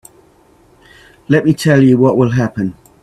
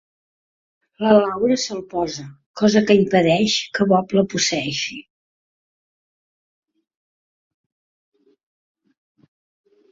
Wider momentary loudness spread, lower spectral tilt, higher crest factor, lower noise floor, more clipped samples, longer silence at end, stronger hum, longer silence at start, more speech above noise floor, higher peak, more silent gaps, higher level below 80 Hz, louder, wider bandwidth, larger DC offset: about the same, 10 LU vs 11 LU; first, -7.5 dB/octave vs -4.5 dB/octave; second, 14 dB vs 20 dB; second, -49 dBFS vs under -90 dBFS; neither; second, 0.3 s vs 4.9 s; neither; first, 1.3 s vs 1 s; second, 37 dB vs over 72 dB; about the same, 0 dBFS vs -2 dBFS; second, none vs 2.46-2.54 s; first, -48 dBFS vs -58 dBFS; first, -12 LUFS vs -18 LUFS; first, 14 kHz vs 7.6 kHz; neither